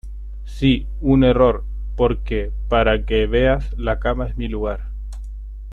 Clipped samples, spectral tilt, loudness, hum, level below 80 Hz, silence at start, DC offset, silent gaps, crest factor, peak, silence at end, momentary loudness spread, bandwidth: under 0.1%; -8 dB/octave; -19 LUFS; none; -26 dBFS; 0.05 s; under 0.1%; none; 16 dB; -2 dBFS; 0 s; 19 LU; 5.8 kHz